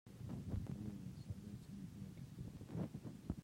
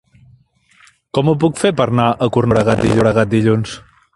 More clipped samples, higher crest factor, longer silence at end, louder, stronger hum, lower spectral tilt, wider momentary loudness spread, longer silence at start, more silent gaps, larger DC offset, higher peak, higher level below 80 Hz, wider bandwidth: neither; first, 22 dB vs 16 dB; second, 0 s vs 0.35 s; second, -50 LUFS vs -15 LUFS; neither; first, -8 dB/octave vs -6.5 dB/octave; about the same, 7 LU vs 6 LU; second, 0.05 s vs 1.15 s; neither; neither; second, -28 dBFS vs 0 dBFS; second, -60 dBFS vs -42 dBFS; first, 16 kHz vs 11.5 kHz